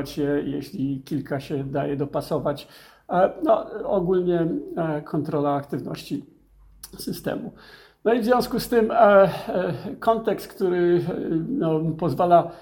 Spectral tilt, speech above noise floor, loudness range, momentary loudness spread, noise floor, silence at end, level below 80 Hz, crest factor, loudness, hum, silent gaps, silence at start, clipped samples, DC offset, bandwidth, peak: -7 dB/octave; 27 dB; 7 LU; 12 LU; -50 dBFS; 0 s; -54 dBFS; 20 dB; -23 LUFS; none; none; 0 s; under 0.1%; under 0.1%; 17.5 kHz; -4 dBFS